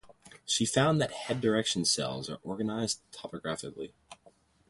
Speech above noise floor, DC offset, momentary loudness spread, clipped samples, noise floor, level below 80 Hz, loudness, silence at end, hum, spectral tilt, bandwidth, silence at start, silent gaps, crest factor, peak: 32 dB; under 0.1%; 16 LU; under 0.1%; -63 dBFS; -64 dBFS; -30 LUFS; 0.55 s; none; -3.5 dB/octave; 11.5 kHz; 0.05 s; none; 20 dB; -12 dBFS